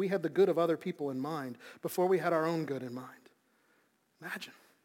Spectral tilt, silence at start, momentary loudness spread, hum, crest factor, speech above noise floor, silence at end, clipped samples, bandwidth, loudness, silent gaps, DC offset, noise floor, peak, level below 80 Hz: -6.5 dB/octave; 0 s; 17 LU; none; 18 dB; 39 dB; 0.35 s; under 0.1%; 17 kHz; -33 LUFS; none; under 0.1%; -72 dBFS; -16 dBFS; -90 dBFS